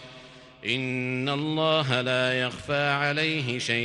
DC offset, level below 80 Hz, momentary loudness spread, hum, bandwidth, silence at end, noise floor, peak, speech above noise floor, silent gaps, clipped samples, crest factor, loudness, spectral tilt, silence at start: under 0.1%; -62 dBFS; 5 LU; none; 11.5 kHz; 0 s; -48 dBFS; -8 dBFS; 22 dB; none; under 0.1%; 20 dB; -26 LUFS; -5 dB/octave; 0 s